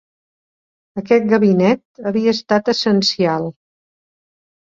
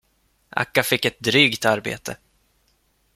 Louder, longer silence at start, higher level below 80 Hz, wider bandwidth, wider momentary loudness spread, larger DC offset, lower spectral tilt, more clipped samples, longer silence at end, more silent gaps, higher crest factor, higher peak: first, -16 LUFS vs -20 LUFS; first, 0.95 s vs 0.55 s; about the same, -60 dBFS vs -58 dBFS; second, 7.6 kHz vs 16.5 kHz; second, 11 LU vs 16 LU; neither; first, -5.5 dB/octave vs -3.5 dB/octave; neither; first, 1.15 s vs 1 s; first, 1.85-1.95 s vs none; second, 16 dB vs 22 dB; about the same, -2 dBFS vs -2 dBFS